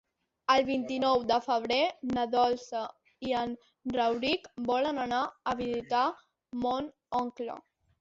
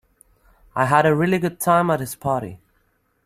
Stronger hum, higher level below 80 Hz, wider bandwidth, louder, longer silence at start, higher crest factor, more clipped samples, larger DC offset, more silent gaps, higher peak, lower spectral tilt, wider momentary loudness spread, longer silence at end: neither; second, -64 dBFS vs -54 dBFS; second, 7.8 kHz vs 16 kHz; second, -31 LUFS vs -20 LUFS; second, 0.5 s vs 0.75 s; about the same, 18 dB vs 20 dB; neither; neither; neither; second, -12 dBFS vs -2 dBFS; second, -4.5 dB/octave vs -6 dB/octave; about the same, 12 LU vs 10 LU; second, 0.4 s vs 0.7 s